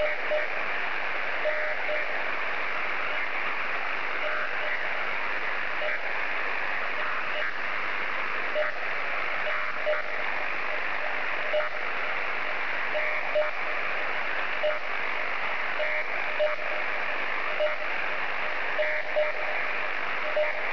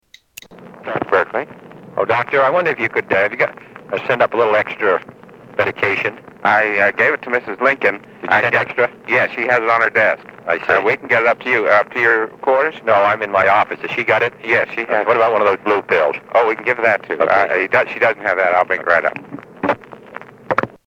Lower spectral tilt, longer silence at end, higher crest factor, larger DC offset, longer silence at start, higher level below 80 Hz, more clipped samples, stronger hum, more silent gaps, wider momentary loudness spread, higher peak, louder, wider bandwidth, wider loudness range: second, -3.5 dB/octave vs -5.5 dB/octave; second, 0 s vs 0.2 s; about the same, 14 dB vs 16 dB; first, 3% vs under 0.1%; second, 0 s vs 0.5 s; second, -66 dBFS vs -60 dBFS; neither; neither; neither; second, 2 LU vs 9 LU; second, -14 dBFS vs 0 dBFS; second, -28 LUFS vs -16 LUFS; second, 5.4 kHz vs over 20 kHz; about the same, 1 LU vs 3 LU